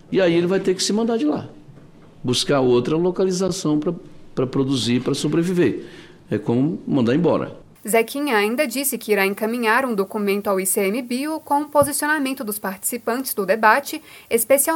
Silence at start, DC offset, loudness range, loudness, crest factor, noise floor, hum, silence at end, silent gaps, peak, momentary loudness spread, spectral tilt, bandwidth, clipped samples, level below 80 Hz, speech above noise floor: 0.1 s; under 0.1%; 2 LU; -20 LUFS; 20 dB; -45 dBFS; none; 0 s; none; 0 dBFS; 9 LU; -4.5 dB/octave; 19 kHz; under 0.1%; -54 dBFS; 25 dB